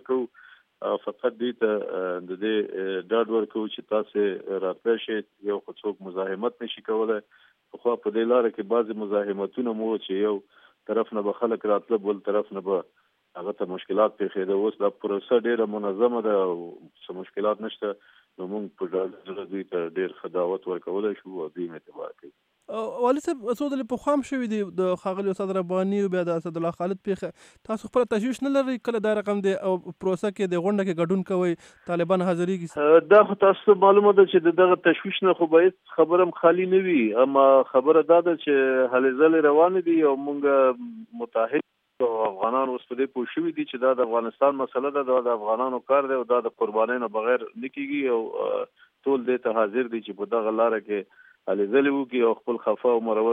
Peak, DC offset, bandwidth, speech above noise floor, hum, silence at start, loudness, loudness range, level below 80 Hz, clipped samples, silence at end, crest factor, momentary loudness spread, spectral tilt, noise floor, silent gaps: -4 dBFS; under 0.1%; 9.8 kHz; 30 dB; none; 0.1 s; -24 LUFS; 10 LU; -74 dBFS; under 0.1%; 0 s; 20 dB; 13 LU; -7 dB/octave; -54 dBFS; none